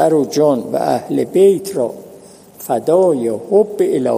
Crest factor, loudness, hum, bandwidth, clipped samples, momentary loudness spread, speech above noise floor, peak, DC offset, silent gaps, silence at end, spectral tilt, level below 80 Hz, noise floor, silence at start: 14 dB; -15 LUFS; none; 15.5 kHz; under 0.1%; 9 LU; 26 dB; 0 dBFS; under 0.1%; none; 0 s; -6.5 dB/octave; -64 dBFS; -40 dBFS; 0 s